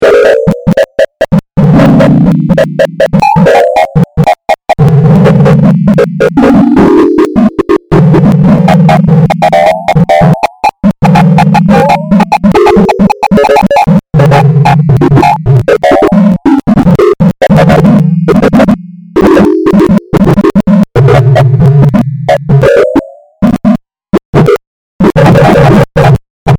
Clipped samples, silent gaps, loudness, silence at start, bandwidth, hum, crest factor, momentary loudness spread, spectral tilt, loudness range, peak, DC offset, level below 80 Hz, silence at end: 10%; 24.25-24.33 s, 24.67-24.99 s, 26.30-26.46 s; -6 LUFS; 0 s; 15.5 kHz; none; 4 dB; 5 LU; -8 dB/octave; 1 LU; 0 dBFS; 0.2%; -26 dBFS; 0 s